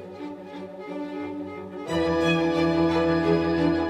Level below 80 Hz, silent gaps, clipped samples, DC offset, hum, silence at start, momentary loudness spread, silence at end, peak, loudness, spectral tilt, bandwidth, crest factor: -48 dBFS; none; under 0.1%; under 0.1%; none; 0 s; 16 LU; 0 s; -10 dBFS; -24 LUFS; -7 dB/octave; 9.6 kHz; 14 dB